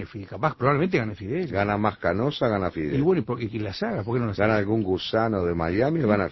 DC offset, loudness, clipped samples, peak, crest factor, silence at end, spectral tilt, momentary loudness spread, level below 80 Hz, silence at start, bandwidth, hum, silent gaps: under 0.1%; -25 LUFS; under 0.1%; -6 dBFS; 18 dB; 0 s; -8.5 dB/octave; 6 LU; -46 dBFS; 0 s; 6 kHz; none; none